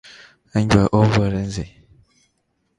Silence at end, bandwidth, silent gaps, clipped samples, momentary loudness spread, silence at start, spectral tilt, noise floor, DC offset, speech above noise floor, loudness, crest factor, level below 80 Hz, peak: 1.1 s; 10.5 kHz; none; under 0.1%; 14 LU; 0.55 s; -7 dB/octave; -69 dBFS; under 0.1%; 52 dB; -19 LUFS; 20 dB; -38 dBFS; 0 dBFS